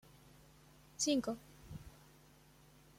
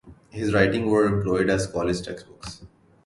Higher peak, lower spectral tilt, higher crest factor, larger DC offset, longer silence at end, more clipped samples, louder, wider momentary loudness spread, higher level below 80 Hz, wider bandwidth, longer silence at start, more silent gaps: second, -22 dBFS vs -4 dBFS; second, -3.5 dB/octave vs -6 dB/octave; about the same, 22 dB vs 20 dB; neither; first, 1.05 s vs 0.4 s; neither; second, -38 LUFS vs -23 LUFS; first, 27 LU vs 19 LU; second, -66 dBFS vs -46 dBFS; first, 16.5 kHz vs 11.5 kHz; first, 1 s vs 0.05 s; neither